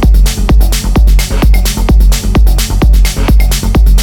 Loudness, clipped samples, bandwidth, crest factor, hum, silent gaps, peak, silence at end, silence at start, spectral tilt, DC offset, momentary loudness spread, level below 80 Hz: -10 LUFS; under 0.1%; 17.5 kHz; 6 dB; none; none; 0 dBFS; 0 s; 0 s; -5 dB/octave; under 0.1%; 1 LU; -6 dBFS